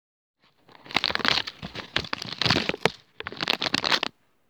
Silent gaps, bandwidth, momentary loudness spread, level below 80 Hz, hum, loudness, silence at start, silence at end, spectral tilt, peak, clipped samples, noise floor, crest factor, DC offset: none; over 20 kHz; 11 LU; -54 dBFS; none; -25 LUFS; 0.85 s; 0.4 s; -3 dB/octave; 0 dBFS; under 0.1%; -56 dBFS; 28 dB; under 0.1%